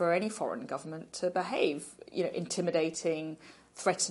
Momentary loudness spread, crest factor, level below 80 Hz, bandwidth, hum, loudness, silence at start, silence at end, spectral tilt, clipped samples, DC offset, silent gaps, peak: 11 LU; 20 dB; -76 dBFS; 11.5 kHz; none; -33 LUFS; 0 s; 0 s; -4 dB/octave; under 0.1%; under 0.1%; none; -14 dBFS